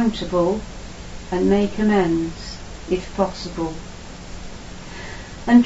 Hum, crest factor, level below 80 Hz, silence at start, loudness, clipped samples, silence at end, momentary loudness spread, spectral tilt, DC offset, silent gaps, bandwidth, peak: none; 20 dB; -38 dBFS; 0 s; -21 LUFS; under 0.1%; 0 s; 18 LU; -6 dB/octave; under 0.1%; none; 8 kHz; -2 dBFS